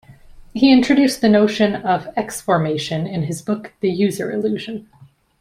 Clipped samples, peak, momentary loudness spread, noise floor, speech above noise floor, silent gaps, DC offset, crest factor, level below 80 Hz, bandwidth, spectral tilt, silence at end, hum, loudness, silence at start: under 0.1%; -2 dBFS; 12 LU; -42 dBFS; 24 dB; none; under 0.1%; 16 dB; -52 dBFS; 16 kHz; -5.5 dB/octave; 0.6 s; none; -18 LUFS; 0.1 s